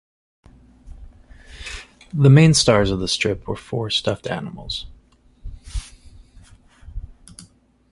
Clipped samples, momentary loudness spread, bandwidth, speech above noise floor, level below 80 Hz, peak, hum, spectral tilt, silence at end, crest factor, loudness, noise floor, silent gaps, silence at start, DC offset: under 0.1%; 27 LU; 11.5 kHz; 36 dB; -40 dBFS; -2 dBFS; none; -5 dB/octave; 0.5 s; 20 dB; -18 LUFS; -53 dBFS; none; 0.85 s; under 0.1%